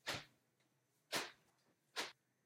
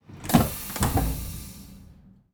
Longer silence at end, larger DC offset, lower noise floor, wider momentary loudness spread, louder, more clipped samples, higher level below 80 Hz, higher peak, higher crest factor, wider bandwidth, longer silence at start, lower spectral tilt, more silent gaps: about the same, 0.35 s vs 0.4 s; neither; first, -81 dBFS vs -52 dBFS; second, 8 LU vs 21 LU; second, -47 LUFS vs -26 LUFS; neither; second, -84 dBFS vs -36 dBFS; second, -26 dBFS vs -4 dBFS; about the same, 24 dB vs 24 dB; second, 16 kHz vs over 20 kHz; about the same, 0.05 s vs 0.1 s; second, -1.5 dB/octave vs -5 dB/octave; neither